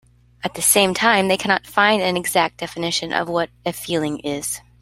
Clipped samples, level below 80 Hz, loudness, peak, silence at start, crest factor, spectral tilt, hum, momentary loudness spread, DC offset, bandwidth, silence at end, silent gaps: under 0.1%; -54 dBFS; -19 LUFS; 0 dBFS; 0.45 s; 20 dB; -2.5 dB/octave; none; 11 LU; under 0.1%; 16 kHz; 0.2 s; none